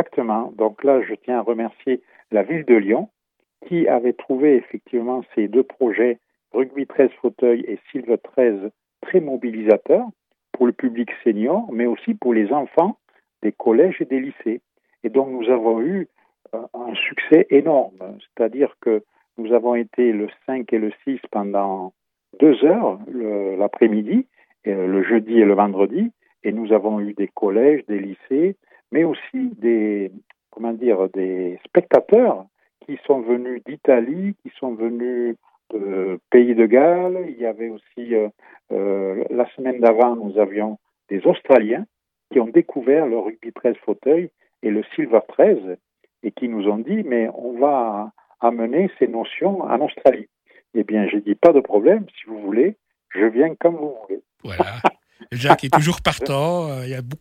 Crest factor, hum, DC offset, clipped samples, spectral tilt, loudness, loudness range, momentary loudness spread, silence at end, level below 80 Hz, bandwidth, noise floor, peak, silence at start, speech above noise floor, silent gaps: 20 dB; none; under 0.1%; under 0.1%; -7 dB/octave; -19 LUFS; 3 LU; 14 LU; 0.05 s; -58 dBFS; 12 kHz; -52 dBFS; 0 dBFS; 0 s; 33 dB; none